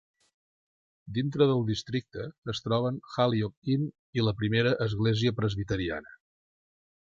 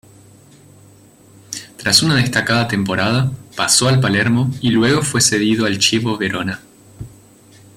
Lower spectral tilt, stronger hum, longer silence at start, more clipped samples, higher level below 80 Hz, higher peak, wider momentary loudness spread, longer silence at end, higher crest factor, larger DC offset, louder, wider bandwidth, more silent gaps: first, -7 dB/octave vs -3.5 dB/octave; neither; second, 1.05 s vs 1.5 s; neither; about the same, -54 dBFS vs -50 dBFS; second, -10 dBFS vs 0 dBFS; second, 10 LU vs 18 LU; first, 1.05 s vs 0.7 s; about the same, 20 dB vs 18 dB; neither; second, -29 LUFS vs -15 LUFS; second, 7.6 kHz vs 16 kHz; first, 2.38-2.42 s, 3.57-3.62 s, 3.99-4.13 s vs none